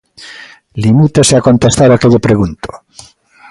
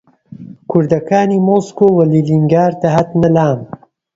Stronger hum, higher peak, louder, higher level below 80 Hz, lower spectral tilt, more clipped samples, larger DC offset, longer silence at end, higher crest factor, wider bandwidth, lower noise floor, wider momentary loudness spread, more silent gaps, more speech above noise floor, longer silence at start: neither; about the same, 0 dBFS vs 0 dBFS; first, -9 LUFS vs -13 LUFS; first, -34 dBFS vs -48 dBFS; second, -5.5 dB/octave vs -8.5 dB/octave; neither; neither; first, 0.75 s vs 0.5 s; about the same, 10 dB vs 12 dB; first, 11.5 kHz vs 7.8 kHz; about the same, -34 dBFS vs -34 dBFS; first, 21 LU vs 6 LU; neither; about the same, 25 dB vs 22 dB; second, 0.2 s vs 0.4 s